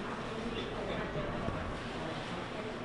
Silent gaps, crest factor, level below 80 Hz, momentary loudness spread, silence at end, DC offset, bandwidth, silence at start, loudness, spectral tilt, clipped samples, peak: none; 20 dB; -50 dBFS; 2 LU; 0 s; under 0.1%; 11.5 kHz; 0 s; -38 LUFS; -6 dB/octave; under 0.1%; -18 dBFS